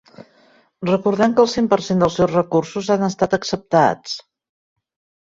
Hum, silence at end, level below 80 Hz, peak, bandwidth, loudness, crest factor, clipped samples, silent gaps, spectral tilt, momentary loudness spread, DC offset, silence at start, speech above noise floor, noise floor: none; 1 s; -52 dBFS; -2 dBFS; 7.8 kHz; -18 LUFS; 18 dB; under 0.1%; none; -6 dB/octave; 8 LU; under 0.1%; 0.2 s; 37 dB; -55 dBFS